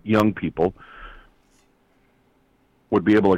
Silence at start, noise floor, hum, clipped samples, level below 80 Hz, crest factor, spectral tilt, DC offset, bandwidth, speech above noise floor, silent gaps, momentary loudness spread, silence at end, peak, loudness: 0.05 s; -62 dBFS; none; under 0.1%; -50 dBFS; 16 dB; -8 dB/octave; under 0.1%; 16 kHz; 43 dB; none; 24 LU; 0 s; -8 dBFS; -21 LUFS